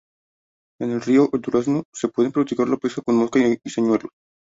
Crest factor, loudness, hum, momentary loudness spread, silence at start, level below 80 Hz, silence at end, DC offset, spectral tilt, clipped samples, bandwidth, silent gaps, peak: 16 dB; -21 LUFS; none; 8 LU; 0.8 s; -62 dBFS; 0.35 s; under 0.1%; -6.5 dB/octave; under 0.1%; 8 kHz; 1.85-1.92 s; -6 dBFS